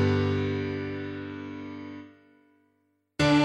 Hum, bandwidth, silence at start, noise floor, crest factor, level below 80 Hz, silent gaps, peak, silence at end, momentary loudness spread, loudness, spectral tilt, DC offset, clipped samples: 50 Hz at -70 dBFS; 11 kHz; 0 s; -72 dBFS; 18 dB; -56 dBFS; none; -12 dBFS; 0 s; 18 LU; -30 LUFS; -6.5 dB/octave; under 0.1%; under 0.1%